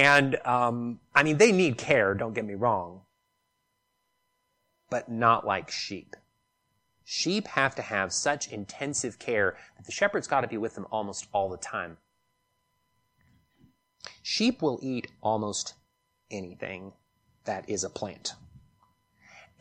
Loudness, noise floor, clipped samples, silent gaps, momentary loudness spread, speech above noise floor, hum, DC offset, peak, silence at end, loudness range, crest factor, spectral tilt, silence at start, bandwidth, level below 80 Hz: -28 LUFS; -77 dBFS; under 0.1%; none; 15 LU; 49 dB; none; under 0.1%; -6 dBFS; 0.2 s; 11 LU; 24 dB; -4 dB/octave; 0 s; 12 kHz; -66 dBFS